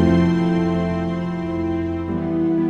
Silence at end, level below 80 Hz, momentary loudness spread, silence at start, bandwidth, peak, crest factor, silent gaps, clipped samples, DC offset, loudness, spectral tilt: 0 s; -40 dBFS; 7 LU; 0 s; 6.6 kHz; -4 dBFS; 14 dB; none; under 0.1%; under 0.1%; -21 LUFS; -9 dB/octave